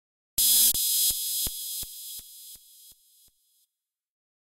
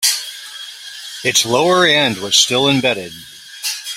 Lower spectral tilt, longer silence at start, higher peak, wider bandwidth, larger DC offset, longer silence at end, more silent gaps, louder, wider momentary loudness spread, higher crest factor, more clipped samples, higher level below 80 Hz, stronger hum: second, 2 dB/octave vs -2 dB/octave; first, 0.4 s vs 0 s; second, -8 dBFS vs 0 dBFS; about the same, 16 kHz vs 16.5 kHz; neither; first, 1.65 s vs 0 s; neither; second, -22 LUFS vs -14 LUFS; first, 24 LU vs 18 LU; about the same, 22 dB vs 18 dB; neither; about the same, -54 dBFS vs -58 dBFS; neither